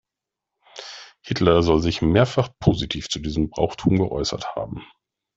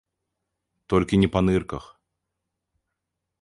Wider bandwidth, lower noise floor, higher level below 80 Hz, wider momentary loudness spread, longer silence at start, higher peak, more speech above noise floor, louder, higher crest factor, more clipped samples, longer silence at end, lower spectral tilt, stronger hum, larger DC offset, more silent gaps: second, 8 kHz vs 11.5 kHz; about the same, -86 dBFS vs -83 dBFS; about the same, -42 dBFS vs -44 dBFS; first, 20 LU vs 15 LU; second, 0.75 s vs 0.9 s; first, -2 dBFS vs -6 dBFS; first, 65 dB vs 61 dB; about the same, -21 LUFS vs -22 LUFS; about the same, 20 dB vs 22 dB; neither; second, 0.5 s vs 1.6 s; second, -6 dB/octave vs -7.5 dB/octave; neither; neither; neither